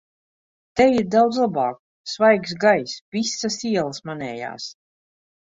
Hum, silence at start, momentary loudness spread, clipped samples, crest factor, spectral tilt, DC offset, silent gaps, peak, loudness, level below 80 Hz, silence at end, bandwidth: none; 0.75 s; 14 LU; under 0.1%; 18 dB; -4.5 dB/octave; under 0.1%; 1.79-2.04 s, 3.01-3.12 s; -4 dBFS; -21 LUFS; -58 dBFS; 0.85 s; 8 kHz